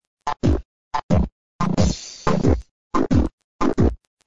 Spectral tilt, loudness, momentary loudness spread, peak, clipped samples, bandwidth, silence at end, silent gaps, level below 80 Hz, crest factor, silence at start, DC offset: -7 dB/octave; -22 LUFS; 8 LU; -2 dBFS; under 0.1%; 8 kHz; 0 s; 0.07-0.17 s, 0.65-0.91 s, 1.03-1.09 s, 1.32-1.59 s, 2.71-2.90 s, 3.33-3.38 s, 3.44-3.59 s, 4.07-4.17 s; -30 dBFS; 18 dB; 0 s; 3%